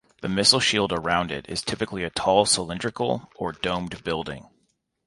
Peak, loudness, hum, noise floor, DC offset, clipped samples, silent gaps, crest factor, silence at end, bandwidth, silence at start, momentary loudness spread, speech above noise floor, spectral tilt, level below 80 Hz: -2 dBFS; -23 LUFS; none; -71 dBFS; under 0.1%; under 0.1%; none; 24 dB; 0.65 s; 11.5 kHz; 0.2 s; 11 LU; 46 dB; -3 dB/octave; -50 dBFS